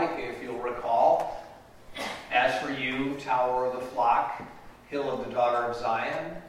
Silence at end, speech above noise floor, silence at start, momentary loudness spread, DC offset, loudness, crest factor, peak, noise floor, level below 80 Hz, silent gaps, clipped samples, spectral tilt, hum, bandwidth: 0 s; 19 dB; 0 s; 12 LU; under 0.1%; -28 LUFS; 18 dB; -10 dBFS; -48 dBFS; -58 dBFS; none; under 0.1%; -5 dB/octave; none; 15.5 kHz